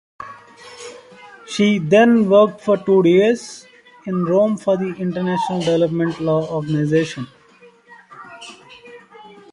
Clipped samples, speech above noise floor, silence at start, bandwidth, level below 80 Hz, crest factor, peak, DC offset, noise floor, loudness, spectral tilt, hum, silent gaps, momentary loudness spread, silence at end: under 0.1%; 33 dB; 0.2 s; 11.5 kHz; -60 dBFS; 16 dB; -2 dBFS; under 0.1%; -49 dBFS; -17 LUFS; -6.5 dB/octave; none; none; 23 LU; 0.3 s